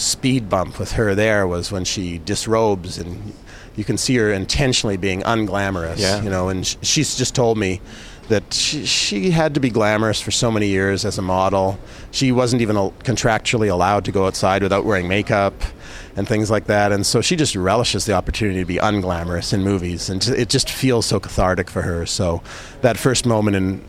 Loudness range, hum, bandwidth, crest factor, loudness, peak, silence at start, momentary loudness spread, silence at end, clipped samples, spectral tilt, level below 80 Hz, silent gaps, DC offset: 2 LU; none; 16 kHz; 18 dB; -19 LUFS; -2 dBFS; 0 s; 7 LU; 0 s; under 0.1%; -4.5 dB/octave; -36 dBFS; none; under 0.1%